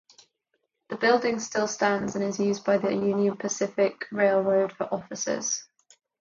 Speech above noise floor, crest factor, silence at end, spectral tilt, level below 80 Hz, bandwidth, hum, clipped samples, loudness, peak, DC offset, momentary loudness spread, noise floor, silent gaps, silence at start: 51 dB; 18 dB; 0.55 s; -4 dB/octave; -70 dBFS; 7.6 kHz; none; under 0.1%; -26 LUFS; -8 dBFS; under 0.1%; 7 LU; -77 dBFS; none; 0.9 s